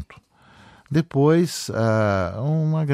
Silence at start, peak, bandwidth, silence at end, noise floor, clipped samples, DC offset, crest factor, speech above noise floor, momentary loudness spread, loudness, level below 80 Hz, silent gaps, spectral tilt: 0 s; -8 dBFS; 15 kHz; 0 s; -52 dBFS; under 0.1%; under 0.1%; 14 dB; 32 dB; 6 LU; -21 LUFS; -54 dBFS; none; -7 dB/octave